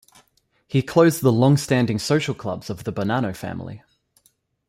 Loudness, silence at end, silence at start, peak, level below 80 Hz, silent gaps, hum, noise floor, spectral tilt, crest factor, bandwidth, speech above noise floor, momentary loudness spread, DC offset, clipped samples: -21 LUFS; 0.9 s; 0.7 s; -4 dBFS; -56 dBFS; none; none; -64 dBFS; -6 dB/octave; 18 dB; 16 kHz; 44 dB; 14 LU; under 0.1%; under 0.1%